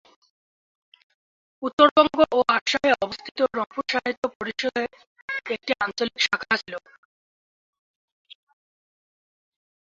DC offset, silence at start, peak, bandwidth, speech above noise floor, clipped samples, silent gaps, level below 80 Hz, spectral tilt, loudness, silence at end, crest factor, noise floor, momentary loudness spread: under 0.1%; 1.6 s; -2 dBFS; 7.8 kHz; over 67 dB; under 0.1%; 1.73-1.78 s, 1.91-1.96 s, 2.61-2.66 s, 3.31-3.35 s, 4.17-4.22 s, 4.35-4.40 s, 5.07-5.16 s, 5.22-5.28 s; -64 dBFS; -3 dB/octave; -23 LUFS; 3.15 s; 24 dB; under -90 dBFS; 14 LU